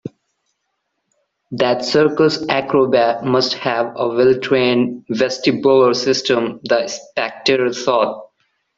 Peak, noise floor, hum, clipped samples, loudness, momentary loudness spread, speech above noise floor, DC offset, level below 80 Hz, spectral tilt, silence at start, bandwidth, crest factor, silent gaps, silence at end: -2 dBFS; -72 dBFS; none; under 0.1%; -16 LUFS; 7 LU; 57 dB; under 0.1%; -58 dBFS; -4.5 dB/octave; 0.05 s; 7.8 kHz; 16 dB; none; 0.55 s